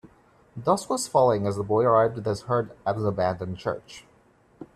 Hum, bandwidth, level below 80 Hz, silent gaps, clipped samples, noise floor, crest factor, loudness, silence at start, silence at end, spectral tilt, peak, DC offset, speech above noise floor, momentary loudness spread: none; 14 kHz; -60 dBFS; none; under 0.1%; -59 dBFS; 18 dB; -25 LUFS; 0.05 s; 0.1 s; -6 dB/octave; -8 dBFS; under 0.1%; 35 dB; 11 LU